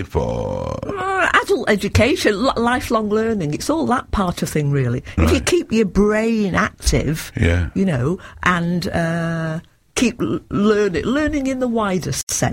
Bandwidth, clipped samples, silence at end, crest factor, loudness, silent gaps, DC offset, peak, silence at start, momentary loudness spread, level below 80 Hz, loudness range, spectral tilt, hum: 16.5 kHz; under 0.1%; 0 s; 18 dB; -19 LUFS; 12.23-12.27 s; under 0.1%; 0 dBFS; 0 s; 7 LU; -32 dBFS; 2 LU; -5 dB/octave; none